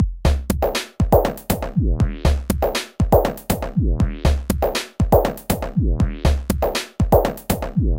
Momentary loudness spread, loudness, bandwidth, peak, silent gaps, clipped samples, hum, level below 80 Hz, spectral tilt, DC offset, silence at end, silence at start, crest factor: 5 LU; -20 LUFS; 17 kHz; -2 dBFS; none; under 0.1%; none; -24 dBFS; -6 dB/octave; under 0.1%; 0 s; 0 s; 16 dB